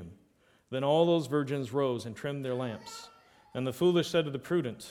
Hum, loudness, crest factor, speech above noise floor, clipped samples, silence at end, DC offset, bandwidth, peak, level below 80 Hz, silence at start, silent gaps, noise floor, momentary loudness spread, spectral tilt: none; -30 LUFS; 20 dB; 36 dB; under 0.1%; 0 s; under 0.1%; 16 kHz; -12 dBFS; -70 dBFS; 0 s; none; -66 dBFS; 16 LU; -6 dB/octave